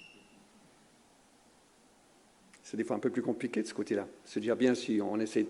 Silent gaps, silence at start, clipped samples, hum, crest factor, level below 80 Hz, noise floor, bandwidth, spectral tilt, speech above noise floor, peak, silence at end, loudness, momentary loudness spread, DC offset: none; 0 s; under 0.1%; none; 20 dB; -80 dBFS; -64 dBFS; 11.5 kHz; -5.5 dB/octave; 31 dB; -16 dBFS; 0 s; -33 LUFS; 12 LU; under 0.1%